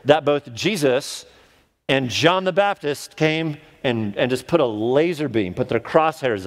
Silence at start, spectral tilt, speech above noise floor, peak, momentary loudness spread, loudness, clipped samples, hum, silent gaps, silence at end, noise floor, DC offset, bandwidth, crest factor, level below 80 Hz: 0.05 s; -5 dB/octave; 36 dB; 0 dBFS; 9 LU; -20 LUFS; under 0.1%; none; none; 0 s; -56 dBFS; under 0.1%; 16 kHz; 20 dB; -58 dBFS